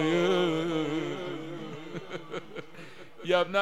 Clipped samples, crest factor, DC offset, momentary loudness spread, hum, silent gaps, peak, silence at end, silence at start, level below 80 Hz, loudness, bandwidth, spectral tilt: under 0.1%; 20 dB; 0.4%; 18 LU; none; none; -10 dBFS; 0 s; 0 s; -68 dBFS; -31 LUFS; 12.5 kHz; -5.5 dB/octave